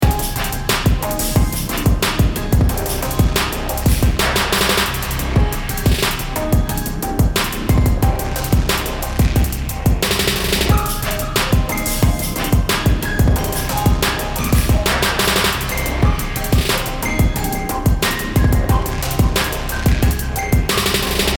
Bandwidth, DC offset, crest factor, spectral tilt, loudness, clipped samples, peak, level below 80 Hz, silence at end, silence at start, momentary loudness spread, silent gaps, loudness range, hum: over 20 kHz; under 0.1%; 14 dB; -4.5 dB/octave; -17 LUFS; under 0.1%; -2 dBFS; -20 dBFS; 0 s; 0 s; 5 LU; none; 1 LU; none